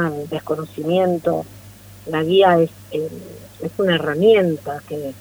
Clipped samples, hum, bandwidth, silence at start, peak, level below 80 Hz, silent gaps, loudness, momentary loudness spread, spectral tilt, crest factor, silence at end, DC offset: under 0.1%; 50 Hz at -45 dBFS; over 20 kHz; 0 s; 0 dBFS; -56 dBFS; none; -19 LUFS; 16 LU; -6.5 dB/octave; 18 dB; 0 s; under 0.1%